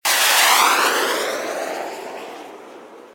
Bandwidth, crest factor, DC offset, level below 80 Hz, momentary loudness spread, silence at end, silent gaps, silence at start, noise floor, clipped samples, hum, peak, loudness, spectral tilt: 17 kHz; 18 dB; under 0.1%; -78 dBFS; 22 LU; 0.1 s; none; 0.05 s; -40 dBFS; under 0.1%; none; -2 dBFS; -16 LUFS; 1.5 dB/octave